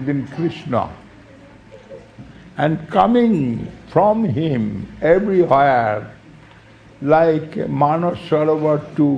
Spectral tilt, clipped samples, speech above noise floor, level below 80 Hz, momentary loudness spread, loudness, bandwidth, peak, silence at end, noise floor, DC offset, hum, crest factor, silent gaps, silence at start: -9 dB/octave; under 0.1%; 28 dB; -48 dBFS; 11 LU; -18 LUFS; 9.2 kHz; 0 dBFS; 0 s; -45 dBFS; under 0.1%; none; 18 dB; none; 0 s